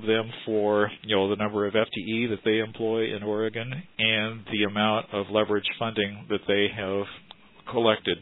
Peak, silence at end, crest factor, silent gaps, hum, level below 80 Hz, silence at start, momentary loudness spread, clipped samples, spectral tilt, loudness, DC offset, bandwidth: -6 dBFS; 0 s; 20 dB; none; none; -64 dBFS; 0 s; 7 LU; under 0.1%; -8.5 dB/octave; -26 LUFS; under 0.1%; 4.1 kHz